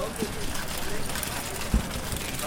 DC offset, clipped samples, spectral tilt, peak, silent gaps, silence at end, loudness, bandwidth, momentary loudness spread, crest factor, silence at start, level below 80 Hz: under 0.1%; under 0.1%; -3.5 dB/octave; -10 dBFS; none; 0 s; -31 LUFS; 17 kHz; 3 LU; 20 dB; 0 s; -34 dBFS